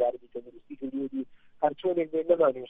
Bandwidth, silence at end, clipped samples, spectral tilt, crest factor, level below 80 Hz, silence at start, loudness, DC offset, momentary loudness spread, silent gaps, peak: 3.8 kHz; 0 s; under 0.1%; -9 dB/octave; 18 dB; -68 dBFS; 0 s; -29 LUFS; under 0.1%; 19 LU; none; -10 dBFS